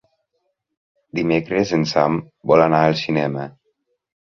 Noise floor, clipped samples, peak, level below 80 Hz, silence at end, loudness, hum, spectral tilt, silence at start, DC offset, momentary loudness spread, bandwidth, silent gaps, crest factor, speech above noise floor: -72 dBFS; under 0.1%; -2 dBFS; -56 dBFS; 0.85 s; -18 LUFS; none; -6.5 dB/octave; 1.15 s; under 0.1%; 12 LU; 7.2 kHz; none; 18 dB; 55 dB